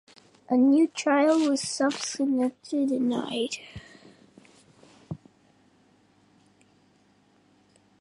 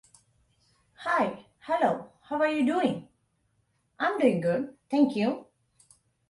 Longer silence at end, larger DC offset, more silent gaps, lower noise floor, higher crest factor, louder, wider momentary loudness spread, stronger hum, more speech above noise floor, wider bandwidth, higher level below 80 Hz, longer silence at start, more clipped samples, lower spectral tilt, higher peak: first, 2.85 s vs 0.85 s; neither; neither; second, -63 dBFS vs -72 dBFS; about the same, 16 dB vs 20 dB; first, -25 LUFS vs -28 LUFS; first, 21 LU vs 12 LU; first, 50 Hz at -65 dBFS vs none; second, 38 dB vs 46 dB; about the same, 11.5 kHz vs 11.5 kHz; first, -66 dBFS vs -72 dBFS; second, 0.5 s vs 1 s; neither; second, -4 dB/octave vs -6.5 dB/octave; about the same, -12 dBFS vs -10 dBFS